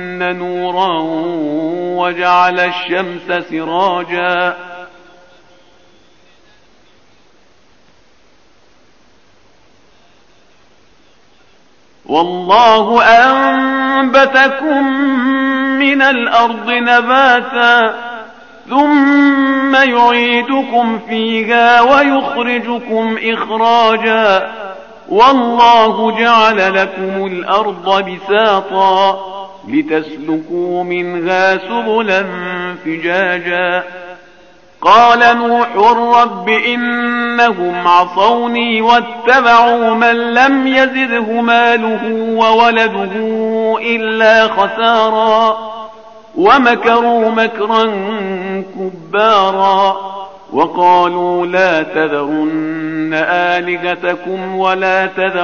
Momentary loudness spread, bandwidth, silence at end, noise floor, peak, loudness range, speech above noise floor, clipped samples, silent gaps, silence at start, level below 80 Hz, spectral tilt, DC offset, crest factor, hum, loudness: 10 LU; 7 kHz; 0 s; -51 dBFS; 0 dBFS; 5 LU; 39 dB; under 0.1%; none; 0 s; -54 dBFS; -1.5 dB/octave; 0.5%; 12 dB; none; -11 LUFS